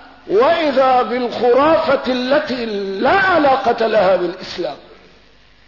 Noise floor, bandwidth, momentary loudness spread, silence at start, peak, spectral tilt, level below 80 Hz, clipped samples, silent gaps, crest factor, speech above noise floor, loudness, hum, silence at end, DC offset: -49 dBFS; 6 kHz; 10 LU; 0.25 s; -6 dBFS; -5.5 dB/octave; -50 dBFS; under 0.1%; none; 10 dB; 34 dB; -15 LUFS; none; 0.9 s; 0.3%